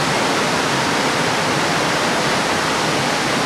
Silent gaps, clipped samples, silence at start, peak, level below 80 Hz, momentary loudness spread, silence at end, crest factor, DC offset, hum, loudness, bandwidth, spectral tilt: none; under 0.1%; 0 s; -6 dBFS; -50 dBFS; 1 LU; 0 s; 12 dB; under 0.1%; none; -17 LUFS; 16.5 kHz; -3 dB/octave